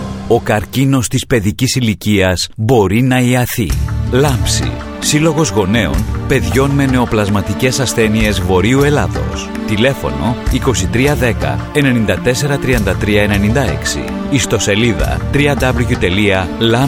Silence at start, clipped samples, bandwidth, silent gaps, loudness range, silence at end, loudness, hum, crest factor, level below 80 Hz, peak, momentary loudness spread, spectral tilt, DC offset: 0 s; under 0.1%; 18.5 kHz; none; 1 LU; 0 s; -13 LUFS; none; 12 dB; -24 dBFS; 0 dBFS; 5 LU; -5 dB/octave; under 0.1%